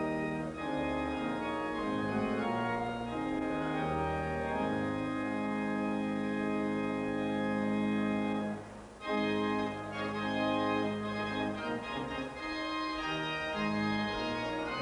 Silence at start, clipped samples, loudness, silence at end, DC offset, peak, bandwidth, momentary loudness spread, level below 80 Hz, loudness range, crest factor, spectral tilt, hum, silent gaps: 0 s; under 0.1%; -34 LUFS; 0 s; under 0.1%; -20 dBFS; 11 kHz; 5 LU; -56 dBFS; 1 LU; 14 dB; -6 dB/octave; none; none